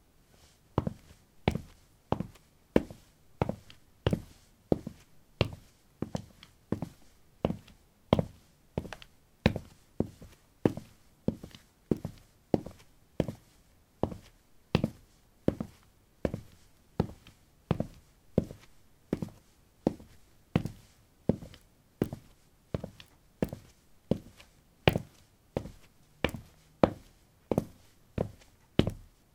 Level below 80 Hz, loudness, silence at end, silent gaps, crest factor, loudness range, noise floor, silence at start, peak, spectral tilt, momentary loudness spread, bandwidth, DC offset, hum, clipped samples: -52 dBFS; -35 LUFS; 0.3 s; none; 34 dB; 4 LU; -63 dBFS; 0.75 s; -2 dBFS; -7 dB/octave; 20 LU; 16.5 kHz; under 0.1%; none; under 0.1%